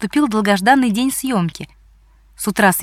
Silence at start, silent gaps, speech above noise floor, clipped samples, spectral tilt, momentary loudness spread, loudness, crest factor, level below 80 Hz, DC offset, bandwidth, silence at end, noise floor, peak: 0 s; none; 33 dB; under 0.1%; -4.5 dB/octave; 12 LU; -16 LUFS; 16 dB; -50 dBFS; under 0.1%; 17 kHz; 0 s; -49 dBFS; 0 dBFS